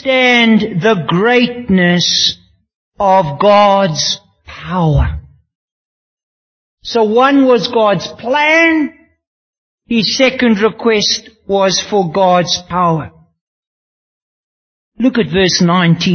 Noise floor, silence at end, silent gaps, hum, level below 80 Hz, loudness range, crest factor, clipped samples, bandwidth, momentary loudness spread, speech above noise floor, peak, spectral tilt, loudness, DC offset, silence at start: under -90 dBFS; 0 s; 2.75-2.92 s, 5.55-6.17 s, 6.23-6.77 s, 9.27-9.78 s, 13.41-14.92 s; none; -34 dBFS; 5 LU; 14 dB; under 0.1%; 6.6 kHz; 9 LU; over 79 dB; 0 dBFS; -4.5 dB/octave; -12 LUFS; under 0.1%; 0.05 s